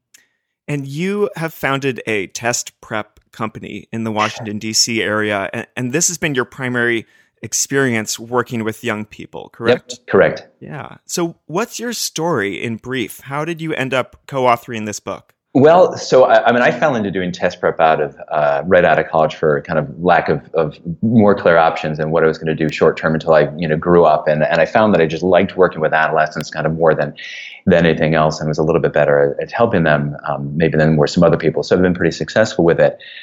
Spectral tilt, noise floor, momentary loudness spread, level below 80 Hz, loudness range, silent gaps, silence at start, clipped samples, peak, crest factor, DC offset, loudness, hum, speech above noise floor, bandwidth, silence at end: -5 dB/octave; -60 dBFS; 12 LU; -48 dBFS; 7 LU; none; 0.7 s; under 0.1%; 0 dBFS; 16 dB; under 0.1%; -16 LUFS; none; 45 dB; 18 kHz; 0 s